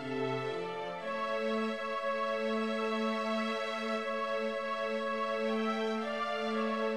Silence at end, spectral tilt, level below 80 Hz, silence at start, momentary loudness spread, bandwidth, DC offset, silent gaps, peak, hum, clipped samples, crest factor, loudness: 0 s; -5 dB/octave; -76 dBFS; 0 s; 3 LU; 12 kHz; 0.1%; none; -22 dBFS; none; under 0.1%; 12 dB; -34 LUFS